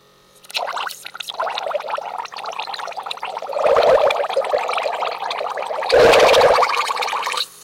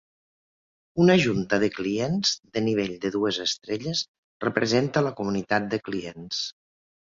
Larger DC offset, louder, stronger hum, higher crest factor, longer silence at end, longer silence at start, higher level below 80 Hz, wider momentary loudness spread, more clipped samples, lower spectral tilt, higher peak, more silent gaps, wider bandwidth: neither; first, -18 LUFS vs -25 LUFS; neither; second, 14 dB vs 20 dB; second, 0 s vs 0.5 s; second, 0.55 s vs 0.95 s; first, -50 dBFS vs -58 dBFS; first, 16 LU vs 10 LU; neither; second, -2 dB/octave vs -5 dB/octave; about the same, -4 dBFS vs -6 dBFS; second, none vs 4.08-4.40 s; first, 16.5 kHz vs 7.6 kHz